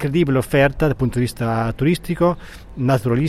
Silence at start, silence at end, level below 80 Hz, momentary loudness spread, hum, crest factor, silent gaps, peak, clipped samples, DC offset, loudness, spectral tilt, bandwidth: 0 s; 0 s; -36 dBFS; 6 LU; none; 16 dB; none; -2 dBFS; under 0.1%; under 0.1%; -19 LUFS; -7 dB/octave; 15 kHz